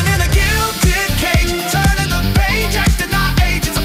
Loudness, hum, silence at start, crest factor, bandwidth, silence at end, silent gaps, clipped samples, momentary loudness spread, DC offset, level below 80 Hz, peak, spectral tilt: -15 LUFS; none; 0 s; 12 dB; 16.5 kHz; 0 s; none; under 0.1%; 2 LU; under 0.1%; -18 dBFS; -2 dBFS; -4 dB/octave